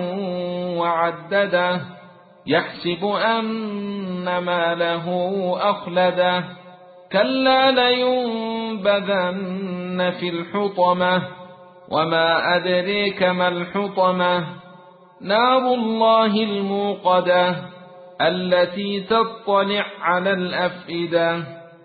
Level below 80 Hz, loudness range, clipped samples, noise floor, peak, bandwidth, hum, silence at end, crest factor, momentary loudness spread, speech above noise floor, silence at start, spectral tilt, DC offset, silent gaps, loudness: -62 dBFS; 3 LU; under 0.1%; -46 dBFS; -4 dBFS; 4.8 kHz; none; 0.15 s; 16 dB; 10 LU; 26 dB; 0 s; -10 dB/octave; under 0.1%; none; -20 LUFS